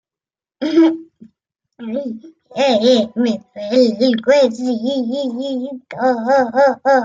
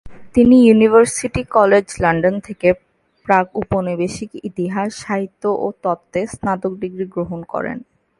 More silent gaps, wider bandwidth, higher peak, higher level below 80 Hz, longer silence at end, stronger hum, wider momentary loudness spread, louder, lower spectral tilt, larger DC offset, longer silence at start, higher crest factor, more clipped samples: neither; second, 7.6 kHz vs 11.5 kHz; about the same, -2 dBFS vs 0 dBFS; second, -66 dBFS vs -44 dBFS; second, 0 s vs 0.4 s; neither; about the same, 13 LU vs 14 LU; about the same, -16 LUFS vs -17 LUFS; about the same, -5 dB/octave vs -6 dB/octave; neither; first, 0.6 s vs 0.05 s; about the same, 14 dB vs 16 dB; neither